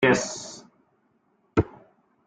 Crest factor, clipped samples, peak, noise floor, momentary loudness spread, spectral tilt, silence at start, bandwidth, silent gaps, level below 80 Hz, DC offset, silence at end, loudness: 22 dB; under 0.1%; -6 dBFS; -68 dBFS; 17 LU; -4.5 dB/octave; 0 s; 9.6 kHz; none; -52 dBFS; under 0.1%; 0.6 s; -27 LUFS